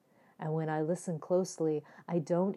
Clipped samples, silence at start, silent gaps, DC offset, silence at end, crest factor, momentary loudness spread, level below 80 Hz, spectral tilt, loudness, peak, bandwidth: under 0.1%; 0.4 s; none; under 0.1%; 0 s; 14 dB; 6 LU; under -90 dBFS; -7 dB/octave; -34 LUFS; -18 dBFS; 12.5 kHz